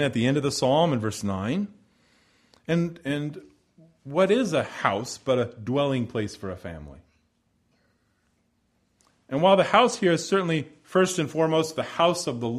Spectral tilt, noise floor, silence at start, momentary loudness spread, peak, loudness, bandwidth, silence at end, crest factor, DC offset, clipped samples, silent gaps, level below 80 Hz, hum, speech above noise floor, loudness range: -5 dB/octave; -70 dBFS; 0 s; 13 LU; -4 dBFS; -24 LUFS; 14 kHz; 0 s; 22 dB; under 0.1%; under 0.1%; none; -60 dBFS; none; 46 dB; 9 LU